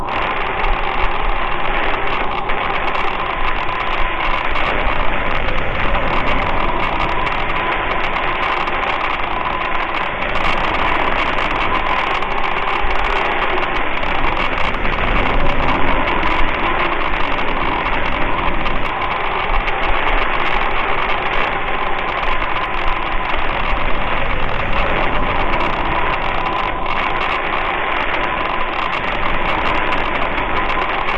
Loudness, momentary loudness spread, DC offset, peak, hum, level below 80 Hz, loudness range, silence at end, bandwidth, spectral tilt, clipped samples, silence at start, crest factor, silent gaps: -18 LUFS; 3 LU; under 0.1%; -2 dBFS; none; -22 dBFS; 2 LU; 0 s; 5.8 kHz; -6 dB/octave; under 0.1%; 0 s; 14 dB; none